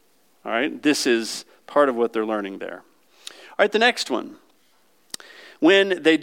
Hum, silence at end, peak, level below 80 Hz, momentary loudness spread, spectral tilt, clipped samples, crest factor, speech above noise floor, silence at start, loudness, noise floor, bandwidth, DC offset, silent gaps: none; 0 s; -4 dBFS; -84 dBFS; 21 LU; -3 dB/octave; under 0.1%; 20 dB; 42 dB; 0.45 s; -21 LUFS; -62 dBFS; 16.5 kHz; under 0.1%; none